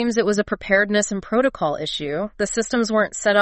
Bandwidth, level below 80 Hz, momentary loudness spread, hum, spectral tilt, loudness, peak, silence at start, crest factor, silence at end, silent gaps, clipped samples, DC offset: 8.8 kHz; -48 dBFS; 7 LU; none; -3.5 dB/octave; -21 LUFS; -4 dBFS; 0 s; 16 dB; 0 s; none; under 0.1%; under 0.1%